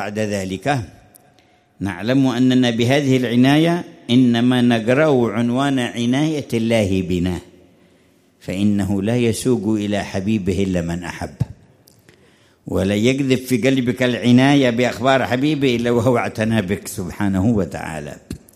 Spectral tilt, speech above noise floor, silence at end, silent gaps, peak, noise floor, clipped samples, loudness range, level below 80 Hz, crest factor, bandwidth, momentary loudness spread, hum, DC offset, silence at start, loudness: -6 dB/octave; 37 dB; 0.2 s; none; -2 dBFS; -55 dBFS; under 0.1%; 6 LU; -48 dBFS; 16 dB; 14.5 kHz; 12 LU; none; under 0.1%; 0 s; -18 LUFS